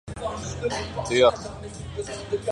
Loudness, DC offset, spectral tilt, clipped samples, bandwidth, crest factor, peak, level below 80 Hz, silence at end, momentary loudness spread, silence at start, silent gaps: -26 LUFS; under 0.1%; -4.5 dB/octave; under 0.1%; 11.5 kHz; 22 dB; -6 dBFS; -44 dBFS; 0 s; 16 LU; 0.05 s; none